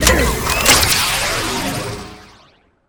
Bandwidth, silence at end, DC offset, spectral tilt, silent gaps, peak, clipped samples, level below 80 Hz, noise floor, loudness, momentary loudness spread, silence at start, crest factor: over 20 kHz; 0.65 s; under 0.1%; -2 dB/octave; none; 0 dBFS; under 0.1%; -26 dBFS; -52 dBFS; -14 LUFS; 17 LU; 0 s; 18 dB